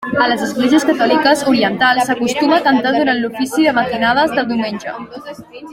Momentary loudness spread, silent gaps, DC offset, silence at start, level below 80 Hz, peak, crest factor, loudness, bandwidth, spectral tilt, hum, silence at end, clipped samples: 14 LU; none; under 0.1%; 0 s; -52 dBFS; -2 dBFS; 14 dB; -14 LUFS; 16.5 kHz; -4 dB/octave; none; 0 s; under 0.1%